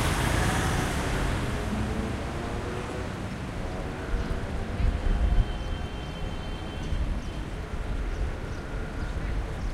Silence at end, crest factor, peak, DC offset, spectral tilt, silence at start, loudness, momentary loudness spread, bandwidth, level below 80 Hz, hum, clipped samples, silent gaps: 0 s; 18 dB; -12 dBFS; under 0.1%; -5.5 dB/octave; 0 s; -31 LUFS; 9 LU; 14.5 kHz; -32 dBFS; none; under 0.1%; none